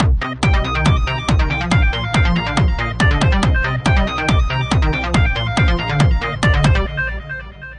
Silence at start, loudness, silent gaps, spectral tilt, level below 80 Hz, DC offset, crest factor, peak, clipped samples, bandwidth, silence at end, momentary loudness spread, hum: 0 s; -17 LUFS; none; -6 dB/octave; -20 dBFS; under 0.1%; 12 dB; -2 dBFS; under 0.1%; 10.5 kHz; 0 s; 3 LU; none